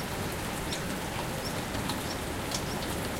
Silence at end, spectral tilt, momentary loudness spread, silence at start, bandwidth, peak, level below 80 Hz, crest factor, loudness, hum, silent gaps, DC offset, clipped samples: 0 s; -4 dB/octave; 1 LU; 0 s; 17 kHz; -16 dBFS; -46 dBFS; 18 dB; -33 LUFS; none; none; under 0.1%; under 0.1%